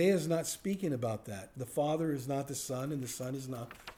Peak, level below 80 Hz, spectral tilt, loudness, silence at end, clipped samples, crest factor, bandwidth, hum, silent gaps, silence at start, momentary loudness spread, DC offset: -18 dBFS; -66 dBFS; -5.5 dB/octave; -36 LUFS; 0.05 s; under 0.1%; 16 dB; over 20 kHz; none; none; 0 s; 10 LU; under 0.1%